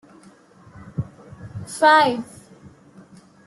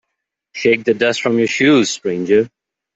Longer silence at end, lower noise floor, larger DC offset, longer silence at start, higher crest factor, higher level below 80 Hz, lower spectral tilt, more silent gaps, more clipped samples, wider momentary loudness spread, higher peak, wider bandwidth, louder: first, 1.25 s vs 0.5 s; second, -50 dBFS vs -77 dBFS; neither; first, 0.8 s vs 0.55 s; first, 20 dB vs 14 dB; about the same, -58 dBFS vs -58 dBFS; about the same, -4.5 dB/octave vs -4.5 dB/octave; neither; neither; first, 24 LU vs 8 LU; about the same, -4 dBFS vs -2 dBFS; first, 12.5 kHz vs 8.2 kHz; second, -18 LUFS vs -15 LUFS